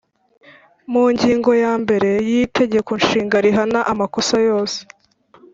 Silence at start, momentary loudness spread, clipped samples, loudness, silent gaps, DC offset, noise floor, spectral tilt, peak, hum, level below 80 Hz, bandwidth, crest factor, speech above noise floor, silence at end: 0.9 s; 5 LU; under 0.1%; -17 LUFS; none; under 0.1%; -50 dBFS; -4.5 dB/octave; -2 dBFS; none; -52 dBFS; 7.8 kHz; 16 dB; 34 dB; 0.7 s